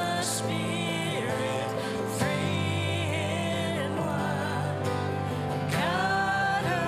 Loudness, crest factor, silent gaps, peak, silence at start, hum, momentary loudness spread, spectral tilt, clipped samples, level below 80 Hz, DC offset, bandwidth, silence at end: -28 LUFS; 16 dB; none; -14 dBFS; 0 s; none; 5 LU; -4.5 dB/octave; under 0.1%; -58 dBFS; under 0.1%; 15.5 kHz; 0 s